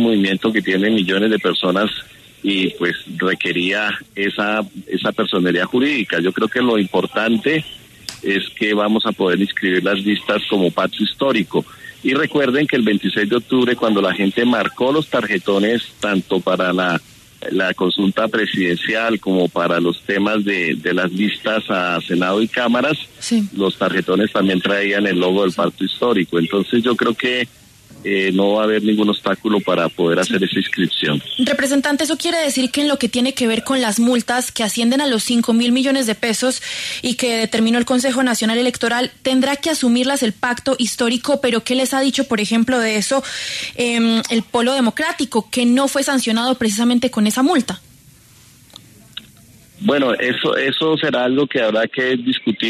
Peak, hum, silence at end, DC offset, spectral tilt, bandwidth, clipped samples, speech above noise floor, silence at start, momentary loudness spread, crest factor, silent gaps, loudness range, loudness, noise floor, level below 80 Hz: -4 dBFS; none; 0 s; under 0.1%; -4 dB/octave; 13.5 kHz; under 0.1%; 30 dB; 0 s; 4 LU; 14 dB; none; 2 LU; -17 LUFS; -47 dBFS; -56 dBFS